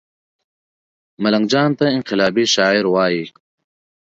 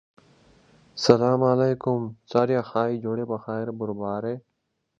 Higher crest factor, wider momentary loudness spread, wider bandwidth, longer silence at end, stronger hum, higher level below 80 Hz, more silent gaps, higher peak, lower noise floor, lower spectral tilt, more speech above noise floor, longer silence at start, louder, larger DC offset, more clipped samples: second, 18 dB vs 24 dB; second, 7 LU vs 11 LU; second, 7.8 kHz vs 9 kHz; first, 0.75 s vs 0.6 s; neither; about the same, -62 dBFS vs -62 dBFS; neither; about the same, -2 dBFS vs 0 dBFS; first, under -90 dBFS vs -77 dBFS; second, -4.5 dB/octave vs -6.5 dB/octave; first, over 74 dB vs 53 dB; first, 1.2 s vs 0.95 s; first, -16 LUFS vs -24 LUFS; neither; neither